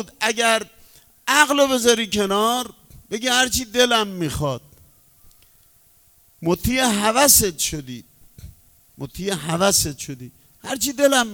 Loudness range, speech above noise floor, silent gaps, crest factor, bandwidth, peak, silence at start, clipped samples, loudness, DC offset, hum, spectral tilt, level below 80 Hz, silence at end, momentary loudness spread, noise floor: 5 LU; 35 dB; none; 22 dB; over 20 kHz; 0 dBFS; 0 s; under 0.1%; -18 LUFS; under 0.1%; none; -2.5 dB/octave; -44 dBFS; 0 s; 18 LU; -55 dBFS